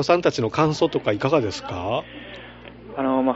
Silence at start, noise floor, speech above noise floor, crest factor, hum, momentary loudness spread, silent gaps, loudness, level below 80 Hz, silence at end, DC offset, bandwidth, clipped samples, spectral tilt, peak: 0 s; -41 dBFS; 19 dB; 18 dB; 60 Hz at -50 dBFS; 19 LU; none; -22 LUFS; -52 dBFS; 0 s; under 0.1%; 8 kHz; under 0.1%; -5 dB/octave; -4 dBFS